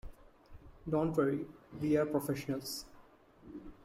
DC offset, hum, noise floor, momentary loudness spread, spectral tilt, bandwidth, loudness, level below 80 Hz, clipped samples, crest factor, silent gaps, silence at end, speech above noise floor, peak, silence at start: under 0.1%; none; -61 dBFS; 20 LU; -6 dB/octave; 16 kHz; -35 LUFS; -58 dBFS; under 0.1%; 18 dB; none; 0.1 s; 26 dB; -18 dBFS; 0.05 s